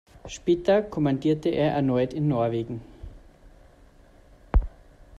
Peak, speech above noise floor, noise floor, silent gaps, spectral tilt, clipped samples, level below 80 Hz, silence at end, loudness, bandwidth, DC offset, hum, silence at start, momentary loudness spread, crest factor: -8 dBFS; 29 dB; -53 dBFS; none; -7.5 dB/octave; under 0.1%; -34 dBFS; 0 s; -25 LUFS; 8.8 kHz; under 0.1%; none; 0.25 s; 17 LU; 18 dB